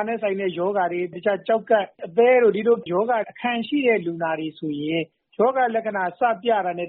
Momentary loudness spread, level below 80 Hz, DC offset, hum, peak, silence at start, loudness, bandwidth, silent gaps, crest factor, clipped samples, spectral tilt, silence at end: 9 LU; -70 dBFS; under 0.1%; none; -6 dBFS; 0 s; -22 LUFS; 4.2 kHz; none; 16 dB; under 0.1%; -3.5 dB/octave; 0 s